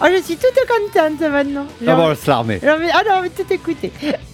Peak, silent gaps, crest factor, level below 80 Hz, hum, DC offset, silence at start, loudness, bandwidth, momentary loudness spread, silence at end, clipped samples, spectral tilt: -2 dBFS; none; 14 dB; -46 dBFS; none; under 0.1%; 0 s; -16 LUFS; 17.5 kHz; 8 LU; 0.05 s; under 0.1%; -5.5 dB/octave